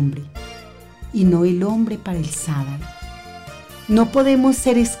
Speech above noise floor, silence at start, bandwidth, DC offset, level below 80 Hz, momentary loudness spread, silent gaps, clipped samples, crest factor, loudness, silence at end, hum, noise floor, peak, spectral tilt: 23 dB; 0 s; 16 kHz; under 0.1%; -40 dBFS; 21 LU; none; under 0.1%; 14 dB; -18 LUFS; 0 s; none; -40 dBFS; -6 dBFS; -6 dB/octave